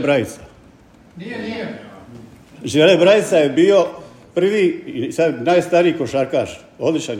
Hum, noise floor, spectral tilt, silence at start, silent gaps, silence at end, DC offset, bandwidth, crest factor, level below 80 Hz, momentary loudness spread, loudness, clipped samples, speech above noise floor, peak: none; -47 dBFS; -5.5 dB/octave; 0 s; none; 0 s; under 0.1%; 15 kHz; 16 dB; -58 dBFS; 17 LU; -16 LUFS; under 0.1%; 30 dB; 0 dBFS